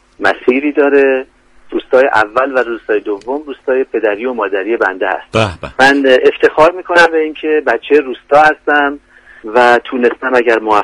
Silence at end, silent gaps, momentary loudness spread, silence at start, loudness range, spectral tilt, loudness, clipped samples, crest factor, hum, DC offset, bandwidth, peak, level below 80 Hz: 0 s; none; 9 LU; 0.2 s; 4 LU; -5 dB/octave; -12 LUFS; 0.3%; 12 dB; none; under 0.1%; 11.5 kHz; 0 dBFS; -46 dBFS